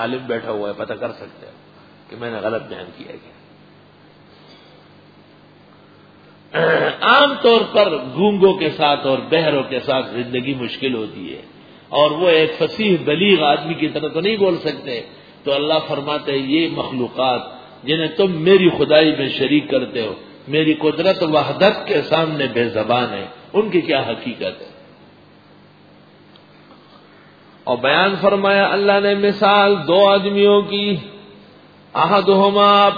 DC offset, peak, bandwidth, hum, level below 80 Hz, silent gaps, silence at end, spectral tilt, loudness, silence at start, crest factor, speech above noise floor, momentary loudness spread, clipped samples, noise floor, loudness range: under 0.1%; 0 dBFS; 5 kHz; 50 Hz at -45 dBFS; -60 dBFS; none; 0 s; -7.5 dB/octave; -16 LUFS; 0 s; 18 dB; 30 dB; 15 LU; under 0.1%; -47 dBFS; 13 LU